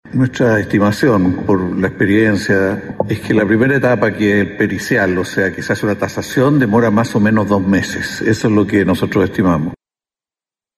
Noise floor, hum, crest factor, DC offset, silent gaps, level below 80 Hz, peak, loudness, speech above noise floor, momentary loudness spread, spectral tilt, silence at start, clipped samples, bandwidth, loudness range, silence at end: under -90 dBFS; none; 12 dB; under 0.1%; none; -44 dBFS; -2 dBFS; -14 LUFS; over 76 dB; 6 LU; -6.5 dB/octave; 0.05 s; under 0.1%; 13.5 kHz; 1 LU; 1 s